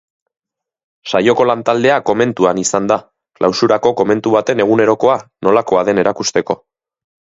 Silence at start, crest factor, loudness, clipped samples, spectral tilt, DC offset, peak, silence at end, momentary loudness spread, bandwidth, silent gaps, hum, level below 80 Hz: 1.05 s; 14 dB; -14 LUFS; under 0.1%; -4.5 dB/octave; under 0.1%; 0 dBFS; 0.8 s; 6 LU; 8 kHz; none; none; -56 dBFS